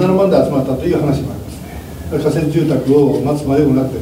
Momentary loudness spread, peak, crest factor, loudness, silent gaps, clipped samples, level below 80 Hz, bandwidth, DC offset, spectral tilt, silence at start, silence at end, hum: 16 LU; 0 dBFS; 14 dB; -15 LUFS; none; under 0.1%; -36 dBFS; 16 kHz; under 0.1%; -8 dB/octave; 0 s; 0 s; none